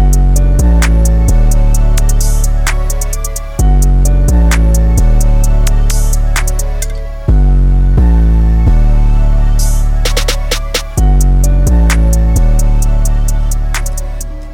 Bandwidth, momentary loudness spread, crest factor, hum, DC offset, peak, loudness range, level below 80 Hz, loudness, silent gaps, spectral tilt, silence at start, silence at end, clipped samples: 16 kHz; 7 LU; 8 dB; none; under 0.1%; 0 dBFS; 1 LU; -8 dBFS; -12 LUFS; none; -5 dB/octave; 0 s; 0 s; under 0.1%